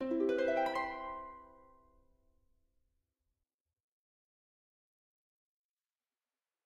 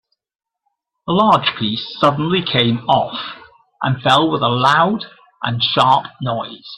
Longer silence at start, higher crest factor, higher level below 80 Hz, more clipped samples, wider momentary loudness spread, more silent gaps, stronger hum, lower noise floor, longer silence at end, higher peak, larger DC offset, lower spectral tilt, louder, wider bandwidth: second, 0 s vs 1.05 s; about the same, 20 dB vs 16 dB; second, -72 dBFS vs -54 dBFS; neither; first, 18 LU vs 12 LU; neither; neither; first, under -90 dBFS vs -84 dBFS; first, 5.15 s vs 0 s; second, -22 dBFS vs 0 dBFS; neither; about the same, -5 dB/octave vs -6 dB/octave; second, -35 LUFS vs -16 LUFS; first, 13 kHz vs 11 kHz